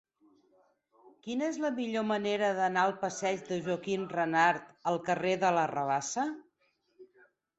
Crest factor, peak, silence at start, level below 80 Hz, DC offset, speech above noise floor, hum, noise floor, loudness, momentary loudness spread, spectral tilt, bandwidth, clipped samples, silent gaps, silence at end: 20 dB; -12 dBFS; 1.05 s; -76 dBFS; under 0.1%; 44 dB; none; -74 dBFS; -31 LUFS; 7 LU; -4.5 dB/octave; 8.2 kHz; under 0.1%; none; 0.55 s